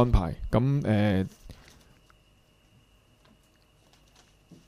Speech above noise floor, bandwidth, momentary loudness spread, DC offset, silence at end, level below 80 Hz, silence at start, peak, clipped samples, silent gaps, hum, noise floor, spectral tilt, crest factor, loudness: 38 dB; 12.5 kHz; 20 LU; under 0.1%; 3.15 s; -38 dBFS; 0 s; -8 dBFS; under 0.1%; none; none; -62 dBFS; -8.5 dB/octave; 20 dB; -27 LUFS